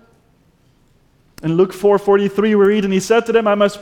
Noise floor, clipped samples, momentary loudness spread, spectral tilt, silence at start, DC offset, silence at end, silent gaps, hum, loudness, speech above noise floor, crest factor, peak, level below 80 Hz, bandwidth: -55 dBFS; under 0.1%; 4 LU; -6 dB/octave; 1.45 s; under 0.1%; 0 s; none; none; -15 LUFS; 41 dB; 14 dB; -2 dBFS; -52 dBFS; 15.5 kHz